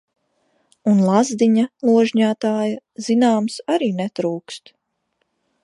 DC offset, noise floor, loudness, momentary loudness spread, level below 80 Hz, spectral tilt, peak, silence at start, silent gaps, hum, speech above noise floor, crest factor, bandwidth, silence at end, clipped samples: under 0.1%; -72 dBFS; -18 LUFS; 10 LU; -72 dBFS; -6 dB/octave; -2 dBFS; 0.85 s; none; none; 54 dB; 16 dB; 11 kHz; 1.05 s; under 0.1%